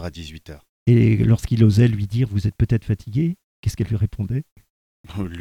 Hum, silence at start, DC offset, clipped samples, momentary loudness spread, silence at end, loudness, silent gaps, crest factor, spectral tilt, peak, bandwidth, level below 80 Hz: none; 0 s; under 0.1%; under 0.1%; 16 LU; 0 s; -20 LUFS; 0.69-0.86 s, 3.44-3.63 s, 4.51-4.56 s, 4.70-5.04 s; 18 dB; -8 dB/octave; -2 dBFS; 12 kHz; -38 dBFS